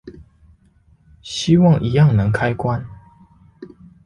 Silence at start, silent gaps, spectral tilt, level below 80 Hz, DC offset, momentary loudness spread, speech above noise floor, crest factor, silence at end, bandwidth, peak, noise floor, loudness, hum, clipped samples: 0.05 s; none; -7 dB/octave; -42 dBFS; under 0.1%; 14 LU; 39 dB; 16 dB; 0.4 s; 10.5 kHz; -2 dBFS; -54 dBFS; -17 LUFS; none; under 0.1%